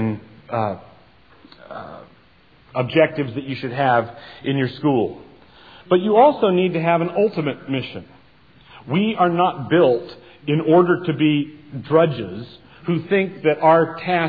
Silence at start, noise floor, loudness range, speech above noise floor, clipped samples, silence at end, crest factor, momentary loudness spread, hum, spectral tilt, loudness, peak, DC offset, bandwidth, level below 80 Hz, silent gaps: 0 s; -53 dBFS; 4 LU; 34 dB; under 0.1%; 0 s; 18 dB; 19 LU; none; -10 dB/octave; -19 LUFS; -2 dBFS; 0.2%; 5 kHz; -60 dBFS; none